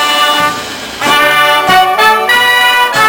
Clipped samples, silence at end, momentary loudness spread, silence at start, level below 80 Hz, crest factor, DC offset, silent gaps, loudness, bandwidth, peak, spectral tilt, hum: under 0.1%; 0 s; 8 LU; 0 s; -44 dBFS; 8 dB; under 0.1%; none; -7 LUFS; 17.5 kHz; 0 dBFS; -1 dB/octave; none